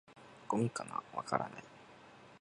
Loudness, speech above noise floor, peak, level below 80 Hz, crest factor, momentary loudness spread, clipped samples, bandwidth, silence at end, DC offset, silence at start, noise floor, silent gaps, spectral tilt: -39 LUFS; 20 dB; -16 dBFS; -76 dBFS; 26 dB; 21 LU; under 0.1%; 11 kHz; 0.05 s; under 0.1%; 0.1 s; -58 dBFS; none; -6 dB/octave